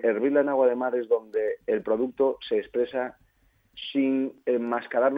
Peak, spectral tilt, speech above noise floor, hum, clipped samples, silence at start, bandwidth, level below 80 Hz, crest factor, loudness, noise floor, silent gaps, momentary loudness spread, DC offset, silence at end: -10 dBFS; -7.5 dB/octave; 40 dB; none; under 0.1%; 0 s; 5 kHz; -68 dBFS; 16 dB; -26 LUFS; -65 dBFS; none; 6 LU; under 0.1%; 0 s